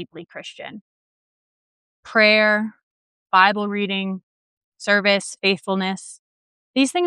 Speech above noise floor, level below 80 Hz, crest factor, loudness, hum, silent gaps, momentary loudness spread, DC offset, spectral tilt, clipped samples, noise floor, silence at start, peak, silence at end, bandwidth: over 70 dB; -76 dBFS; 20 dB; -19 LUFS; none; 0.81-2.03 s, 2.83-3.26 s, 4.23-4.72 s, 6.19-6.74 s; 21 LU; under 0.1%; -4 dB/octave; under 0.1%; under -90 dBFS; 0 s; -2 dBFS; 0 s; 11.5 kHz